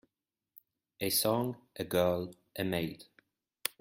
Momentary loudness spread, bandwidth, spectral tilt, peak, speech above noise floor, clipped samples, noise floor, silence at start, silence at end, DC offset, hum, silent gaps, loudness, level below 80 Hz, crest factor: 13 LU; 16.5 kHz; -4 dB/octave; -12 dBFS; over 57 dB; under 0.1%; under -90 dBFS; 1 s; 0.15 s; under 0.1%; none; none; -33 LUFS; -68 dBFS; 24 dB